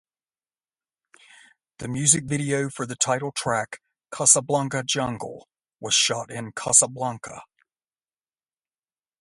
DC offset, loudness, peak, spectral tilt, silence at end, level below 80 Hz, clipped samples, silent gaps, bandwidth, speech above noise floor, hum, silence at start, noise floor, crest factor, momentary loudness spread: under 0.1%; -22 LUFS; -2 dBFS; -2.5 dB/octave; 1.75 s; -62 dBFS; under 0.1%; none; 11.5 kHz; over 66 dB; none; 1.8 s; under -90 dBFS; 26 dB; 20 LU